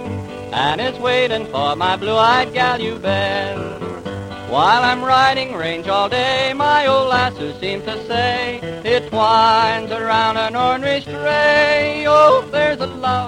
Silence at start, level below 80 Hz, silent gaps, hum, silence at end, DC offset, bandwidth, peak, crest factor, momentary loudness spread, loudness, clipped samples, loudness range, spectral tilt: 0 s; -48 dBFS; none; none; 0 s; under 0.1%; 15 kHz; 0 dBFS; 16 dB; 12 LU; -16 LUFS; under 0.1%; 2 LU; -4.5 dB/octave